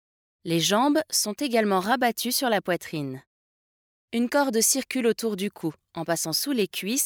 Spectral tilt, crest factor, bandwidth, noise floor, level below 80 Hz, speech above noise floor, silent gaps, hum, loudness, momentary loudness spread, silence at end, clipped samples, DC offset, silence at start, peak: -3 dB/octave; 18 dB; over 20 kHz; under -90 dBFS; -72 dBFS; over 65 dB; 3.27-4.08 s; none; -25 LUFS; 12 LU; 0 s; under 0.1%; under 0.1%; 0.45 s; -8 dBFS